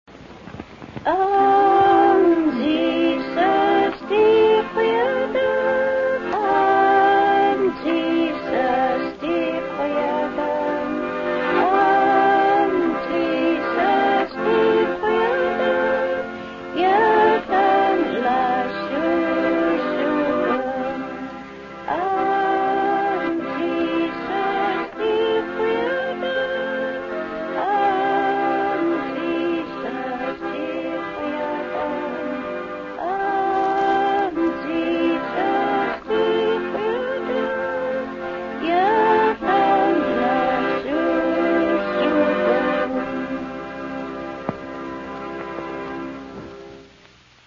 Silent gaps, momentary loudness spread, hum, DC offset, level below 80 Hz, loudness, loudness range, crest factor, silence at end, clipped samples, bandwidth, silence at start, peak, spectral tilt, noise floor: none; 13 LU; none; under 0.1%; -54 dBFS; -20 LUFS; 6 LU; 14 dB; 0.65 s; under 0.1%; 7.2 kHz; 0.1 s; -6 dBFS; -6.5 dB/octave; -50 dBFS